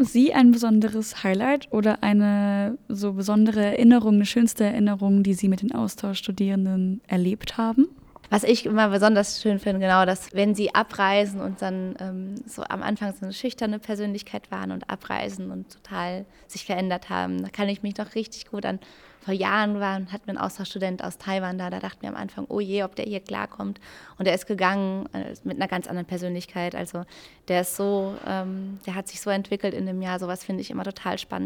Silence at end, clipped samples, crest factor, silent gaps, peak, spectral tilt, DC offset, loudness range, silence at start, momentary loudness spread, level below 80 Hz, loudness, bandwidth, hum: 0 s; under 0.1%; 20 dB; none; -4 dBFS; -5.5 dB/octave; under 0.1%; 10 LU; 0 s; 13 LU; -58 dBFS; -24 LUFS; 17.5 kHz; none